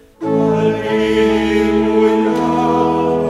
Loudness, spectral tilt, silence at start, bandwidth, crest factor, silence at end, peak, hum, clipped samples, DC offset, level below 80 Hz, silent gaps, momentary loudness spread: -14 LUFS; -7 dB/octave; 0.2 s; 12 kHz; 12 dB; 0 s; -2 dBFS; none; under 0.1%; under 0.1%; -38 dBFS; none; 3 LU